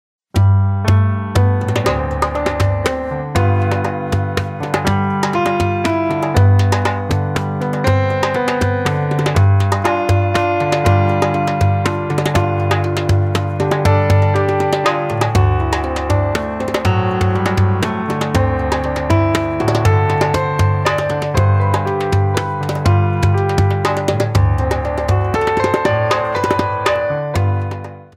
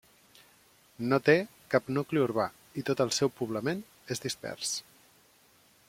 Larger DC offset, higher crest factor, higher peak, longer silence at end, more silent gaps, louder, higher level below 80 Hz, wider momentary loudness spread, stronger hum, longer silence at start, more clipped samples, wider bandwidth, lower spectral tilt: neither; second, 14 dB vs 24 dB; first, -2 dBFS vs -8 dBFS; second, 0.1 s vs 1.1 s; neither; first, -16 LUFS vs -30 LUFS; first, -32 dBFS vs -70 dBFS; second, 5 LU vs 11 LU; neither; second, 0.35 s vs 1 s; neither; second, 13.5 kHz vs 16.5 kHz; first, -6.5 dB/octave vs -4.5 dB/octave